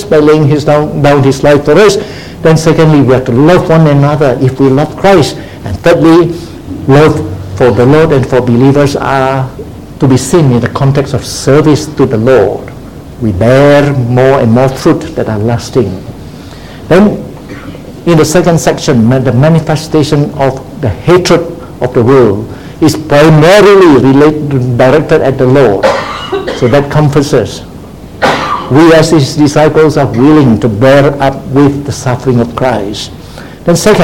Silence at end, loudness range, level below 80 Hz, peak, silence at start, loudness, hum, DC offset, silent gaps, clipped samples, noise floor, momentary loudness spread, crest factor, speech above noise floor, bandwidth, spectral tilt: 0 s; 4 LU; -32 dBFS; 0 dBFS; 0 s; -7 LUFS; none; 1%; none; 3%; -26 dBFS; 15 LU; 6 dB; 20 dB; 16.5 kHz; -6.5 dB/octave